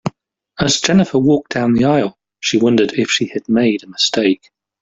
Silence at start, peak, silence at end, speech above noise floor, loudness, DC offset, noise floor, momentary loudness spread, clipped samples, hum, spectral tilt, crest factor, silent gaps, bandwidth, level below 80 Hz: 0.05 s; -2 dBFS; 0.45 s; 35 dB; -15 LUFS; under 0.1%; -49 dBFS; 7 LU; under 0.1%; none; -4.5 dB/octave; 14 dB; none; 7.8 kHz; -50 dBFS